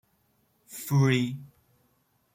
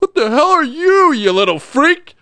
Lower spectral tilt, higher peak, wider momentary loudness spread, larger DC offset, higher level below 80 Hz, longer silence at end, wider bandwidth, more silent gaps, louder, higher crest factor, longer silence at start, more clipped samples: first, -6 dB/octave vs -4 dB/octave; second, -12 dBFS vs 0 dBFS; first, 20 LU vs 3 LU; neither; second, -68 dBFS vs -58 dBFS; first, 0.9 s vs 0.25 s; first, 16.5 kHz vs 10 kHz; neither; second, -26 LUFS vs -12 LUFS; first, 18 dB vs 12 dB; first, 0.7 s vs 0 s; neither